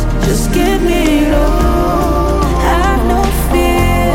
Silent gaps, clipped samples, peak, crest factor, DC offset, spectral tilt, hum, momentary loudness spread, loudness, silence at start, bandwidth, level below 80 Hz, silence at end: none; under 0.1%; 0 dBFS; 10 dB; 0.3%; -5.5 dB/octave; none; 2 LU; -13 LUFS; 0 s; 17 kHz; -16 dBFS; 0 s